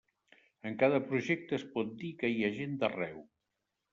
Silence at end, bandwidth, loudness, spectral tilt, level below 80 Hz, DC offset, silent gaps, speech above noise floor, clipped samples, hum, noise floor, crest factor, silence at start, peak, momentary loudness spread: 0.7 s; 7.6 kHz; -34 LUFS; -5 dB/octave; -74 dBFS; under 0.1%; none; 52 dB; under 0.1%; none; -86 dBFS; 20 dB; 0.65 s; -14 dBFS; 12 LU